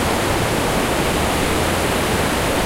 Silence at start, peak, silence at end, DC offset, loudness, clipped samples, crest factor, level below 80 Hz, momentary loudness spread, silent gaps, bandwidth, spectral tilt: 0 s; -6 dBFS; 0 s; under 0.1%; -18 LUFS; under 0.1%; 12 dB; -30 dBFS; 0 LU; none; 16 kHz; -4 dB/octave